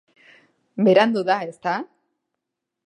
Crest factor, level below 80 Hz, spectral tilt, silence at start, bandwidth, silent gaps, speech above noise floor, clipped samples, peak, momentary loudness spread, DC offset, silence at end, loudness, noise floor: 22 dB; -78 dBFS; -6.5 dB/octave; 0.75 s; 10.5 kHz; none; 62 dB; under 0.1%; -2 dBFS; 18 LU; under 0.1%; 1.05 s; -20 LUFS; -82 dBFS